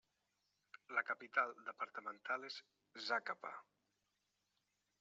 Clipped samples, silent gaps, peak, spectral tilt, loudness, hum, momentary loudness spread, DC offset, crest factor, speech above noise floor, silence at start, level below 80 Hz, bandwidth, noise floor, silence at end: under 0.1%; none; -22 dBFS; 1.5 dB/octave; -44 LUFS; none; 17 LU; under 0.1%; 24 dB; 42 dB; 0.9 s; under -90 dBFS; 7.6 kHz; -87 dBFS; 1.4 s